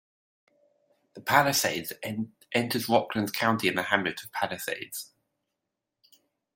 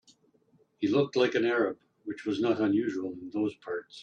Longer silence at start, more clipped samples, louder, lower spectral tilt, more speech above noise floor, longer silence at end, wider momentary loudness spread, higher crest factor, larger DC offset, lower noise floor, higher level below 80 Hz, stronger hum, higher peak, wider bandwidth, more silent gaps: first, 1.15 s vs 0.8 s; neither; about the same, -27 LUFS vs -29 LUFS; second, -3.5 dB/octave vs -6.5 dB/octave; first, 57 dB vs 38 dB; first, 1.5 s vs 0 s; about the same, 13 LU vs 12 LU; first, 26 dB vs 18 dB; neither; first, -85 dBFS vs -67 dBFS; about the same, -70 dBFS vs -74 dBFS; neither; first, -4 dBFS vs -12 dBFS; first, 16.5 kHz vs 8.8 kHz; neither